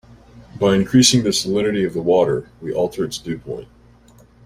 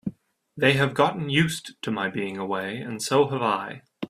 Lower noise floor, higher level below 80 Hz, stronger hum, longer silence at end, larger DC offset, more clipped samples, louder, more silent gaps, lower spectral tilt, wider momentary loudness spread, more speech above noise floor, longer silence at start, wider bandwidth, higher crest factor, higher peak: about the same, -49 dBFS vs -47 dBFS; first, -48 dBFS vs -62 dBFS; neither; first, 0.8 s vs 0 s; neither; neither; first, -18 LUFS vs -24 LUFS; neither; about the same, -4.5 dB/octave vs -5 dB/octave; first, 15 LU vs 11 LU; first, 31 dB vs 23 dB; first, 0.35 s vs 0.05 s; about the same, 16 kHz vs 15.5 kHz; about the same, 20 dB vs 22 dB; first, 0 dBFS vs -4 dBFS